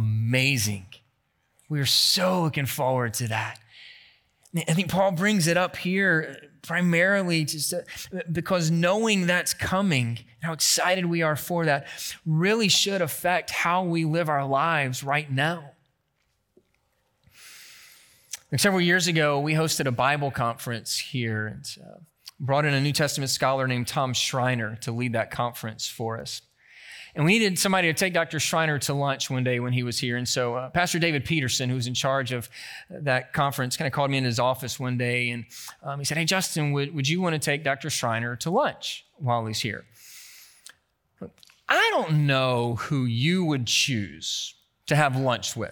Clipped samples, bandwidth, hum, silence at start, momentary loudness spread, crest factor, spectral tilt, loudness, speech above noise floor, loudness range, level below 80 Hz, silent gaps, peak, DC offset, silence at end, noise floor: under 0.1%; 19 kHz; none; 0 s; 13 LU; 20 dB; -4 dB/octave; -24 LUFS; 48 dB; 4 LU; -62 dBFS; none; -6 dBFS; under 0.1%; 0 s; -73 dBFS